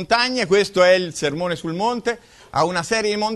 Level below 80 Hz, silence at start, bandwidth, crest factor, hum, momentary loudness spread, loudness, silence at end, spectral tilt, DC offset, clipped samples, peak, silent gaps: -54 dBFS; 0 s; 12.5 kHz; 16 dB; none; 10 LU; -19 LUFS; 0 s; -4 dB/octave; under 0.1%; under 0.1%; -4 dBFS; none